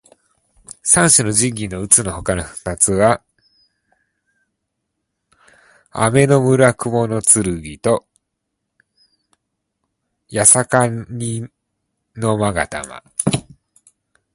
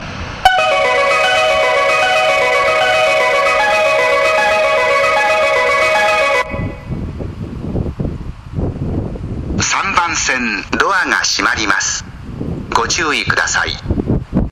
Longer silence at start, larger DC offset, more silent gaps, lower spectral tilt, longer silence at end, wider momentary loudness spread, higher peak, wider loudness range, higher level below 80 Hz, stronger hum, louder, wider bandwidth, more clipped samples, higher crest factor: first, 0.85 s vs 0 s; neither; neither; about the same, -4 dB/octave vs -3 dB/octave; first, 0.9 s vs 0 s; about the same, 14 LU vs 12 LU; about the same, 0 dBFS vs 0 dBFS; about the same, 7 LU vs 7 LU; second, -44 dBFS vs -32 dBFS; neither; about the same, -15 LUFS vs -13 LUFS; about the same, 16 kHz vs 15.5 kHz; neither; first, 20 dB vs 14 dB